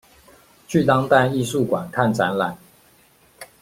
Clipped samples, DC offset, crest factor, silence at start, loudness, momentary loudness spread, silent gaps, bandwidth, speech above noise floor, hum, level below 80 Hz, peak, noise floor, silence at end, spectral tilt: under 0.1%; under 0.1%; 20 dB; 0.7 s; -20 LUFS; 8 LU; none; 16.5 kHz; 36 dB; none; -56 dBFS; -2 dBFS; -55 dBFS; 0.15 s; -6 dB/octave